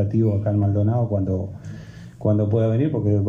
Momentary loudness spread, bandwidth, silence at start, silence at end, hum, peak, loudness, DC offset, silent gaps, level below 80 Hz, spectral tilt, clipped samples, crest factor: 17 LU; 3.7 kHz; 0 s; 0 s; none; -8 dBFS; -21 LUFS; under 0.1%; none; -52 dBFS; -11 dB/octave; under 0.1%; 12 dB